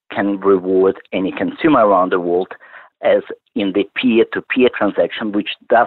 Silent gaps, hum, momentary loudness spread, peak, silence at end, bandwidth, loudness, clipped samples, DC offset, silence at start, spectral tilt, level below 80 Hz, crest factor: none; none; 8 LU; -2 dBFS; 0 s; 4.3 kHz; -16 LUFS; under 0.1%; under 0.1%; 0.1 s; -9.5 dB/octave; -58 dBFS; 14 dB